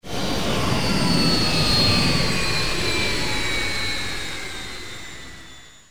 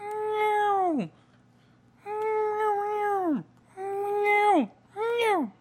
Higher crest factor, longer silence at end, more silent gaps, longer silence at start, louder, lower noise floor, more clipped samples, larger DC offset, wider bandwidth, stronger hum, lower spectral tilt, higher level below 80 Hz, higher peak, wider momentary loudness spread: about the same, 16 dB vs 16 dB; about the same, 0 s vs 0.1 s; neither; about the same, 0 s vs 0 s; first, -21 LUFS vs -27 LUFS; second, -44 dBFS vs -60 dBFS; neither; first, 5% vs under 0.1%; first, over 20 kHz vs 15.5 kHz; neither; second, -3.5 dB/octave vs -5.5 dB/octave; first, -36 dBFS vs -76 dBFS; first, -6 dBFS vs -12 dBFS; first, 17 LU vs 12 LU